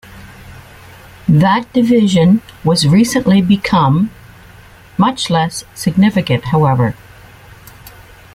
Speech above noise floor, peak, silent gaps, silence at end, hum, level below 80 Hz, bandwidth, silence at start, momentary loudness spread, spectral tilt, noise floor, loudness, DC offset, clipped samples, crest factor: 28 dB; -2 dBFS; none; 0.45 s; none; -42 dBFS; 15.5 kHz; 0.1 s; 9 LU; -6 dB/octave; -40 dBFS; -13 LUFS; under 0.1%; under 0.1%; 12 dB